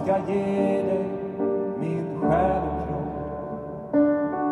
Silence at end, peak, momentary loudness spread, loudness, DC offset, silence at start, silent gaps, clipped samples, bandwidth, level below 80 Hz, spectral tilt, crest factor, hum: 0 s; -10 dBFS; 10 LU; -25 LUFS; under 0.1%; 0 s; none; under 0.1%; 10.5 kHz; -44 dBFS; -9 dB/octave; 16 dB; none